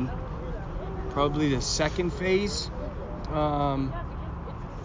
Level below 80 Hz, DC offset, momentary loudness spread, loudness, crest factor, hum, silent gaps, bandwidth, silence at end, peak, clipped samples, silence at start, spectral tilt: -36 dBFS; under 0.1%; 11 LU; -29 LUFS; 16 dB; none; none; 7.8 kHz; 0 s; -12 dBFS; under 0.1%; 0 s; -5 dB/octave